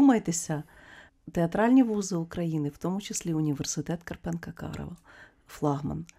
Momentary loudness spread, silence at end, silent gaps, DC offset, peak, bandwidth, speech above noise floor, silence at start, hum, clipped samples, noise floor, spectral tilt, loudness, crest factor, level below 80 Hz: 17 LU; 0.15 s; none; under 0.1%; -10 dBFS; 14.5 kHz; 24 dB; 0 s; none; under 0.1%; -53 dBFS; -5.5 dB/octave; -29 LUFS; 20 dB; -54 dBFS